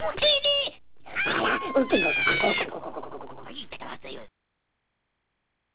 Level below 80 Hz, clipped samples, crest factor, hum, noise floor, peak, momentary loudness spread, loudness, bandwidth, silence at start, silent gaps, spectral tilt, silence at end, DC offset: -58 dBFS; under 0.1%; 18 dB; none; -78 dBFS; -10 dBFS; 20 LU; -23 LUFS; 4 kHz; 0 s; none; 0 dB/octave; 0 s; 0.6%